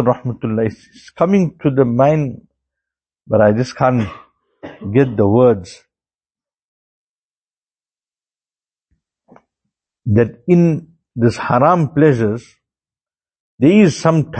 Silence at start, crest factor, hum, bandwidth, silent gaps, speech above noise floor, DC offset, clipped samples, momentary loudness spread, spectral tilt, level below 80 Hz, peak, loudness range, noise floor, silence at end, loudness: 0 s; 16 dB; none; 8.8 kHz; 6.59-7.48 s, 7.57-7.62 s, 13.40-13.58 s; over 76 dB; under 0.1%; under 0.1%; 10 LU; -8 dB/octave; -50 dBFS; 0 dBFS; 5 LU; under -90 dBFS; 0 s; -15 LUFS